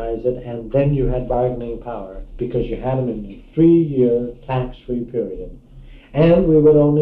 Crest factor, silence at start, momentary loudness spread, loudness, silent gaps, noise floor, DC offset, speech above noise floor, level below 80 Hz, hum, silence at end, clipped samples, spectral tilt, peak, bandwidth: 14 dB; 0 s; 16 LU; -18 LUFS; none; -40 dBFS; under 0.1%; 23 dB; -34 dBFS; none; 0 s; under 0.1%; -11.5 dB/octave; -2 dBFS; 4.4 kHz